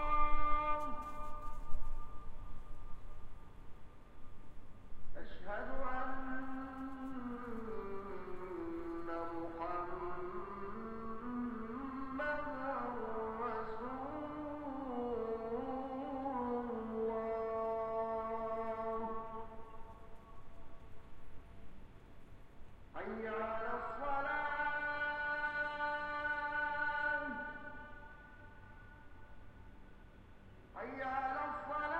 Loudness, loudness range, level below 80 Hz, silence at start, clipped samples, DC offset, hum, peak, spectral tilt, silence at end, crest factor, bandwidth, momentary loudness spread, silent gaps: -41 LUFS; 15 LU; -50 dBFS; 0 s; under 0.1%; under 0.1%; none; -18 dBFS; -7 dB/octave; 0 s; 20 dB; 4.6 kHz; 22 LU; none